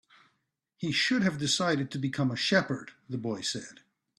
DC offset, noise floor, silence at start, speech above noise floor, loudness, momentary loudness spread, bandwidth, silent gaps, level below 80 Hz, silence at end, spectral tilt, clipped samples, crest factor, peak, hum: under 0.1%; -79 dBFS; 0.8 s; 49 dB; -29 LUFS; 12 LU; 12.5 kHz; none; -68 dBFS; 0.45 s; -4 dB/octave; under 0.1%; 20 dB; -12 dBFS; none